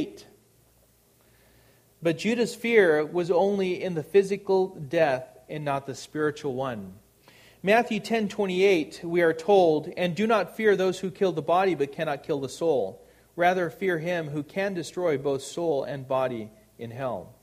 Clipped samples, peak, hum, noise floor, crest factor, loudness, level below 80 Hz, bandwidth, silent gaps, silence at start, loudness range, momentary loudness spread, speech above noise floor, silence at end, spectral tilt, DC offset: under 0.1%; -6 dBFS; none; -62 dBFS; 20 dB; -26 LUFS; -66 dBFS; 15 kHz; none; 0 s; 5 LU; 11 LU; 36 dB; 0.1 s; -5.5 dB/octave; under 0.1%